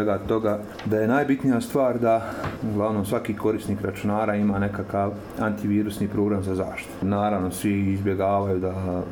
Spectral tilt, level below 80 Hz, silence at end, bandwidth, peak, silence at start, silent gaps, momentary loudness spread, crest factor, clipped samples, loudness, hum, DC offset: -7.5 dB/octave; -50 dBFS; 0 s; over 20 kHz; -10 dBFS; 0 s; none; 6 LU; 14 dB; under 0.1%; -25 LUFS; none; under 0.1%